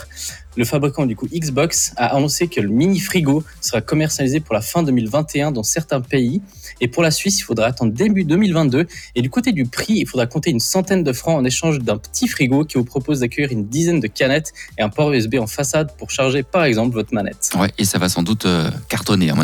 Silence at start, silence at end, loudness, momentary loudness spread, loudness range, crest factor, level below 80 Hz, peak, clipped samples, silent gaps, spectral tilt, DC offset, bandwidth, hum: 0 s; 0 s; -18 LUFS; 5 LU; 1 LU; 14 dB; -44 dBFS; -4 dBFS; under 0.1%; none; -4.5 dB/octave; under 0.1%; 20 kHz; none